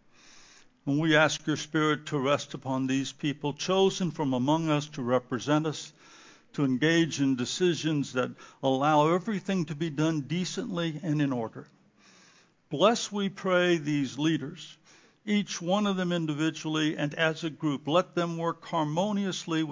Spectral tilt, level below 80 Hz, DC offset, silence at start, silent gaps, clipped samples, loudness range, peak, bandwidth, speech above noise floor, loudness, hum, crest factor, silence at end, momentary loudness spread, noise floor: -5 dB/octave; -72 dBFS; under 0.1%; 0.35 s; none; under 0.1%; 3 LU; -8 dBFS; 7.6 kHz; 33 dB; -28 LUFS; none; 20 dB; 0 s; 8 LU; -61 dBFS